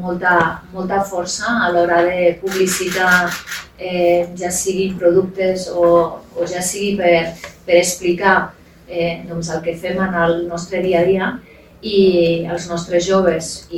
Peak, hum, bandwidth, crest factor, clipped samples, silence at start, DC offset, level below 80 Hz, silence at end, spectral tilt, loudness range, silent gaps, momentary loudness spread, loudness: 0 dBFS; none; 19 kHz; 16 dB; under 0.1%; 0 s; under 0.1%; -46 dBFS; 0 s; -4 dB/octave; 2 LU; none; 10 LU; -17 LUFS